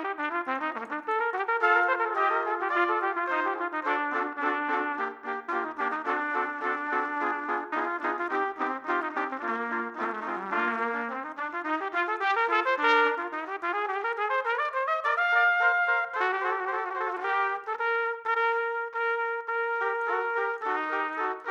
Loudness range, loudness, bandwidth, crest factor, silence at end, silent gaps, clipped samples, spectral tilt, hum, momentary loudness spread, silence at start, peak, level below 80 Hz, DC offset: 4 LU; -28 LUFS; 8.8 kHz; 20 dB; 0 s; none; under 0.1%; -3.5 dB/octave; none; 8 LU; 0 s; -10 dBFS; -86 dBFS; under 0.1%